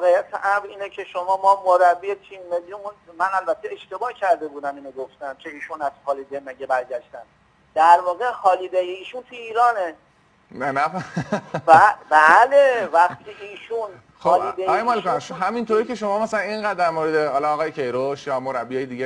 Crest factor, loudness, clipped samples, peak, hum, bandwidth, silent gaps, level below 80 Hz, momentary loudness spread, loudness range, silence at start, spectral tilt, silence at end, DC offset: 20 dB; -20 LUFS; under 0.1%; 0 dBFS; none; 10.5 kHz; none; -66 dBFS; 18 LU; 10 LU; 0 s; -5 dB/octave; 0 s; under 0.1%